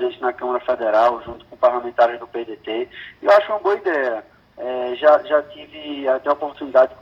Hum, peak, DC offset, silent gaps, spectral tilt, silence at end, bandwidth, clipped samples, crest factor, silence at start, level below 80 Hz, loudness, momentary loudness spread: none; -2 dBFS; under 0.1%; none; -5 dB/octave; 0.05 s; 7 kHz; under 0.1%; 18 dB; 0 s; -58 dBFS; -19 LUFS; 15 LU